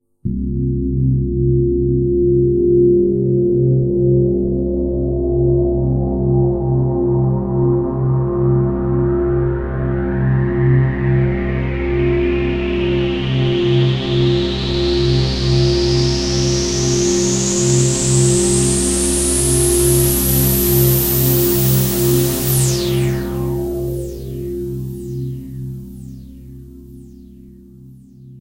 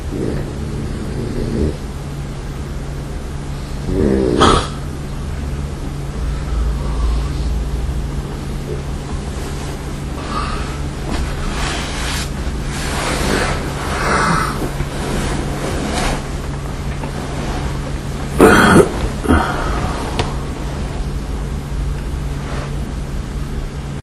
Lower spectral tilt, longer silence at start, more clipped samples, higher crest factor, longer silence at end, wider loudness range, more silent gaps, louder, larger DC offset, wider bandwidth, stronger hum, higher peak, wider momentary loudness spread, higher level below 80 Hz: about the same, -5.5 dB/octave vs -5.5 dB/octave; first, 0.25 s vs 0 s; neither; about the same, 14 dB vs 18 dB; about the same, 0 s vs 0 s; about the same, 9 LU vs 9 LU; neither; first, -16 LUFS vs -20 LUFS; neither; first, 16 kHz vs 13.5 kHz; neither; about the same, -2 dBFS vs 0 dBFS; about the same, 9 LU vs 11 LU; about the same, -26 dBFS vs -24 dBFS